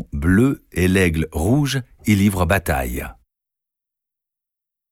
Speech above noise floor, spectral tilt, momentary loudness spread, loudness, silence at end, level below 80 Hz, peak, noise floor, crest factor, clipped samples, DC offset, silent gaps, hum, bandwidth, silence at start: 67 dB; -6 dB/octave; 8 LU; -19 LUFS; 1.8 s; -34 dBFS; -2 dBFS; -85 dBFS; 18 dB; under 0.1%; under 0.1%; none; none; 17 kHz; 0 s